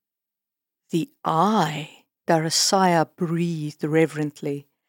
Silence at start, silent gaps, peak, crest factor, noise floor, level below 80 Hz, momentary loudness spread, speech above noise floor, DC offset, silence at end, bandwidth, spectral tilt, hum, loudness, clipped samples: 0.95 s; none; -4 dBFS; 18 dB; -87 dBFS; -88 dBFS; 13 LU; 65 dB; under 0.1%; 0.25 s; 17 kHz; -4.5 dB/octave; none; -22 LUFS; under 0.1%